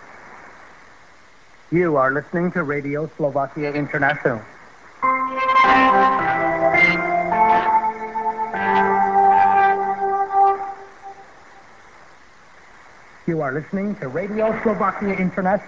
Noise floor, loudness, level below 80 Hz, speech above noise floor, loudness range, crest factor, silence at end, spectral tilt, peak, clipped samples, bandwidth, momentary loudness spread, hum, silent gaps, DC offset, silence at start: -50 dBFS; -19 LUFS; -52 dBFS; 29 dB; 10 LU; 18 dB; 0 s; -7 dB/octave; -2 dBFS; under 0.1%; 7.4 kHz; 11 LU; none; none; 0.3%; 0 s